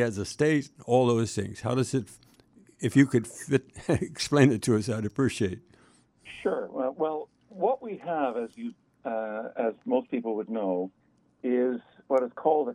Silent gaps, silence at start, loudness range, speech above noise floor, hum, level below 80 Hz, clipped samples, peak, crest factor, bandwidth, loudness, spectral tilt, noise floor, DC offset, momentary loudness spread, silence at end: none; 0 s; 6 LU; 34 dB; none; -62 dBFS; under 0.1%; -8 dBFS; 20 dB; 13.5 kHz; -28 LUFS; -6 dB/octave; -61 dBFS; under 0.1%; 13 LU; 0 s